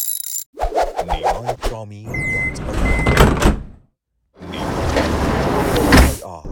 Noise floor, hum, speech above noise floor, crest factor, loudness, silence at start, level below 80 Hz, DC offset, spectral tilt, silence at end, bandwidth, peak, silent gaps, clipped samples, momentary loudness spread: -66 dBFS; none; 45 dB; 18 dB; -18 LUFS; 0 s; -24 dBFS; under 0.1%; -5 dB/octave; 0 s; 19 kHz; 0 dBFS; 0.46-0.53 s; under 0.1%; 14 LU